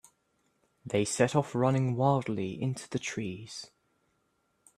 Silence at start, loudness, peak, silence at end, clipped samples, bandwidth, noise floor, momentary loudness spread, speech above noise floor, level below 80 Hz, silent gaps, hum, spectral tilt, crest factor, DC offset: 0.85 s; -30 LUFS; -10 dBFS; 1.1 s; under 0.1%; 12.5 kHz; -75 dBFS; 16 LU; 45 dB; -68 dBFS; none; none; -5.5 dB/octave; 22 dB; under 0.1%